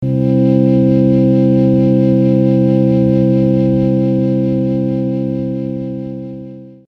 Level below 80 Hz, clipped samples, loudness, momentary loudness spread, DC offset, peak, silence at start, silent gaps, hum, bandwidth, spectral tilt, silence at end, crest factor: -40 dBFS; under 0.1%; -13 LUFS; 12 LU; under 0.1%; 0 dBFS; 0 s; none; none; 5.2 kHz; -11.5 dB/octave; 0.15 s; 12 dB